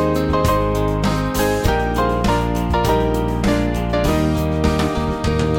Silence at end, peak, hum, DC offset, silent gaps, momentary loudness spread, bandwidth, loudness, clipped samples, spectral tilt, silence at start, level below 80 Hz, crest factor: 0 s; -2 dBFS; none; 0.1%; none; 2 LU; 17 kHz; -18 LUFS; under 0.1%; -6 dB/octave; 0 s; -26 dBFS; 14 dB